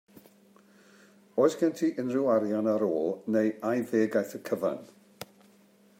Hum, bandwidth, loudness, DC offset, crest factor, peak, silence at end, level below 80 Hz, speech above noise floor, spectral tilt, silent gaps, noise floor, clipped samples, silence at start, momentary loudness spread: none; 16 kHz; -28 LUFS; under 0.1%; 20 dB; -10 dBFS; 0.75 s; -80 dBFS; 33 dB; -6.5 dB/octave; none; -60 dBFS; under 0.1%; 1.35 s; 15 LU